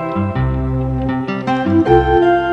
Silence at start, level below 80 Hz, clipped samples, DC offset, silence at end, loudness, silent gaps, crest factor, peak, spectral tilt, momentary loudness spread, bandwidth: 0 s; -28 dBFS; under 0.1%; under 0.1%; 0 s; -15 LUFS; none; 14 dB; 0 dBFS; -9 dB/octave; 7 LU; 6.6 kHz